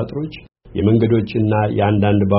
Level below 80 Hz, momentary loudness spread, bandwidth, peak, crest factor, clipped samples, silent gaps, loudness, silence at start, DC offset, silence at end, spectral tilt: -42 dBFS; 12 LU; 5.6 kHz; -2 dBFS; 16 dB; under 0.1%; none; -17 LUFS; 0 s; under 0.1%; 0 s; -7.5 dB/octave